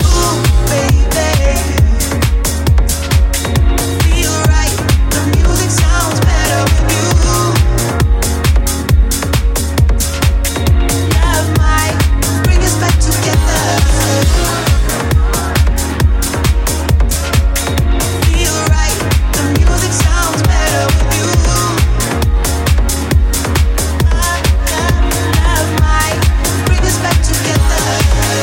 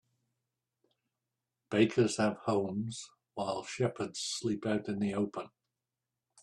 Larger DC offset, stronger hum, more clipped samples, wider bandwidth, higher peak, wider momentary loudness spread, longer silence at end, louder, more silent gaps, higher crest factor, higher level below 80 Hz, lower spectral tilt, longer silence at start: neither; neither; neither; first, 17 kHz vs 12 kHz; first, 0 dBFS vs -12 dBFS; second, 2 LU vs 12 LU; second, 0 s vs 0.95 s; first, -12 LUFS vs -33 LUFS; neither; second, 10 dB vs 22 dB; first, -14 dBFS vs -72 dBFS; about the same, -4.5 dB/octave vs -5 dB/octave; second, 0 s vs 1.7 s